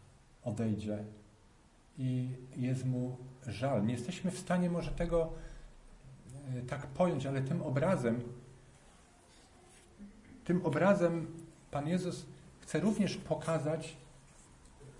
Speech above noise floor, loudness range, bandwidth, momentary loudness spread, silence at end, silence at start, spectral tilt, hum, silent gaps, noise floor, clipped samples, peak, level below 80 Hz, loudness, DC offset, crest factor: 29 dB; 4 LU; 11.5 kHz; 20 LU; 0 s; 0 s; -7 dB/octave; none; none; -63 dBFS; under 0.1%; -16 dBFS; -54 dBFS; -35 LUFS; under 0.1%; 20 dB